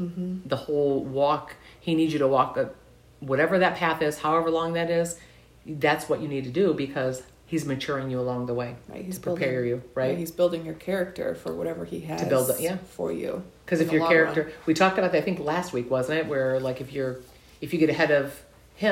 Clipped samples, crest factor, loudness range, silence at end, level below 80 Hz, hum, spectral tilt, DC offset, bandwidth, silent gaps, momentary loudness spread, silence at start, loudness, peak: under 0.1%; 18 dB; 4 LU; 0 s; -58 dBFS; none; -5.5 dB/octave; under 0.1%; 16 kHz; none; 11 LU; 0 s; -26 LUFS; -8 dBFS